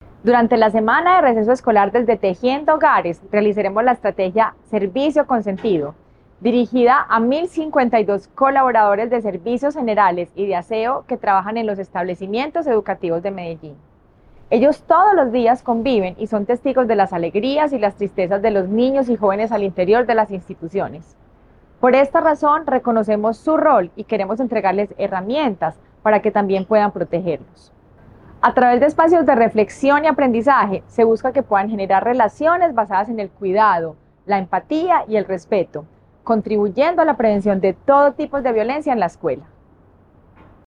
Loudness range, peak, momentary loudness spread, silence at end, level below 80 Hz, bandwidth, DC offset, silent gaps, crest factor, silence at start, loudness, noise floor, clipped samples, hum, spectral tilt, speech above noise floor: 4 LU; 0 dBFS; 9 LU; 1.3 s; -52 dBFS; 10 kHz; under 0.1%; none; 16 dB; 0.25 s; -17 LUFS; -50 dBFS; under 0.1%; none; -7 dB/octave; 34 dB